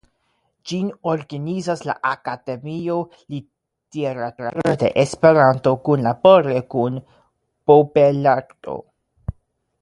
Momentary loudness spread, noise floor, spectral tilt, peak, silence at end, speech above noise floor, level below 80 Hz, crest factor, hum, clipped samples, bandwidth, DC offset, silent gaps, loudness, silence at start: 20 LU; -68 dBFS; -7 dB/octave; 0 dBFS; 0.5 s; 50 dB; -50 dBFS; 20 dB; none; under 0.1%; 11 kHz; under 0.1%; none; -18 LUFS; 0.65 s